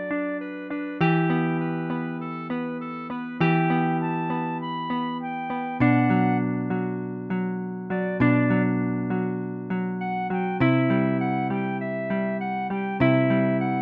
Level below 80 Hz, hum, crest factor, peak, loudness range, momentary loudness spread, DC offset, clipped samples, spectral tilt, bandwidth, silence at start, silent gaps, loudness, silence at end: -58 dBFS; none; 18 dB; -8 dBFS; 3 LU; 10 LU; under 0.1%; under 0.1%; -10.5 dB/octave; 5 kHz; 0 s; none; -25 LUFS; 0 s